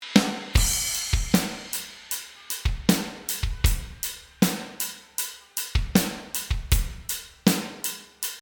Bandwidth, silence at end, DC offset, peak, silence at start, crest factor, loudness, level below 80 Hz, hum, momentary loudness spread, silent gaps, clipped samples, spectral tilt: over 20 kHz; 0 s; under 0.1%; -2 dBFS; 0 s; 24 dB; -26 LUFS; -32 dBFS; none; 9 LU; none; under 0.1%; -3.5 dB/octave